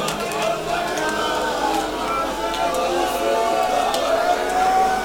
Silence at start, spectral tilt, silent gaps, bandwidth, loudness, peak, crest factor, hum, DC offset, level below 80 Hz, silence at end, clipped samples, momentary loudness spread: 0 s; -3 dB/octave; none; over 20 kHz; -21 LUFS; -6 dBFS; 14 dB; none; under 0.1%; -44 dBFS; 0 s; under 0.1%; 4 LU